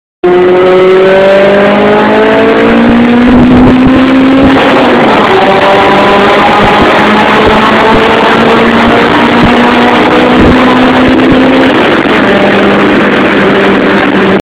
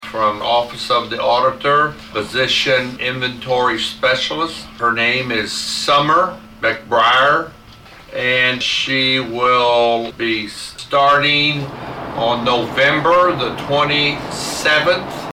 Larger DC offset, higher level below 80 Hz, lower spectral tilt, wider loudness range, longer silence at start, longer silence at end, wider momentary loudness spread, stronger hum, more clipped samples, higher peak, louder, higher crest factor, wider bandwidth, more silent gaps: neither; first, -26 dBFS vs -48 dBFS; first, -6.5 dB/octave vs -3.5 dB/octave; about the same, 1 LU vs 2 LU; first, 0.25 s vs 0 s; about the same, 0 s vs 0 s; second, 2 LU vs 9 LU; neither; first, 6% vs under 0.1%; about the same, 0 dBFS vs -2 dBFS; first, -4 LUFS vs -15 LUFS; second, 4 dB vs 14 dB; second, 11 kHz vs 16.5 kHz; neither